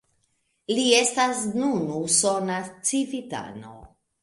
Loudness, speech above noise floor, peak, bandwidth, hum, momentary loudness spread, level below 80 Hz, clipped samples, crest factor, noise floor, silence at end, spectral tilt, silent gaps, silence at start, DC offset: -23 LUFS; 47 dB; -4 dBFS; 11.5 kHz; none; 16 LU; -62 dBFS; under 0.1%; 22 dB; -71 dBFS; 0.35 s; -2.5 dB/octave; none; 0.7 s; under 0.1%